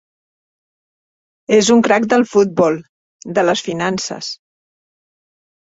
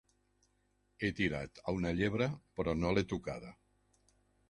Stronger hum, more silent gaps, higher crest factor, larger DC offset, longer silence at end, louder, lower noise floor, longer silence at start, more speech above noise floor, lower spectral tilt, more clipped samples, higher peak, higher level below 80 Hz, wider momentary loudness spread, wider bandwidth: second, none vs 50 Hz at -55 dBFS; first, 2.89-3.19 s vs none; about the same, 16 dB vs 20 dB; neither; first, 1.35 s vs 0.95 s; first, -15 LUFS vs -36 LUFS; first, under -90 dBFS vs -76 dBFS; first, 1.5 s vs 1 s; first, over 75 dB vs 41 dB; second, -4 dB/octave vs -6.5 dB/octave; neither; first, -2 dBFS vs -18 dBFS; second, -60 dBFS vs -54 dBFS; first, 15 LU vs 9 LU; second, 8 kHz vs 11 kHz